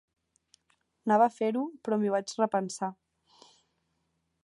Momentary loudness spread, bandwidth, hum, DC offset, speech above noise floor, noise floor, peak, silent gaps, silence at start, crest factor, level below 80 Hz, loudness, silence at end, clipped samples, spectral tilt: 12 LU; 11.5 kHz; none; under 0.1%; 50 dB; -78 dBFS; -10 dBFS; none; 1.05 s; 20 dB; -84 dBFS; -29 LUFS; 1.5 s; under 0.1%; -5.5 dB/octave